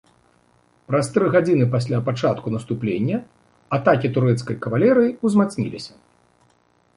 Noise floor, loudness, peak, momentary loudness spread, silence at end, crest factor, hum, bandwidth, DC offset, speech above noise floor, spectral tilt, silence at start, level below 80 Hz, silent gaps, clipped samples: -61 dBFS; -20 LUFS; -4 dBFS; 9 LU; 1.1 s; 18 dB; none; 11.5 kHz; under 0.1%; 41 dB; -7.5 dB/octave; 0.9 s; -58 dBFS; none; under 0.1%